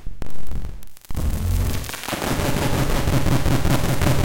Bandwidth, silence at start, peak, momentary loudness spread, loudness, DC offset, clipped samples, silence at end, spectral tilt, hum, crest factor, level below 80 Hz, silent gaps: 17 kHz; 0 s; -8 dBFS; 14 LU; -22 LUFS; under 0.1%; under 0.1%; 0 s; -5.5 dB/octave; none; 10 dB; -26 dBFS; none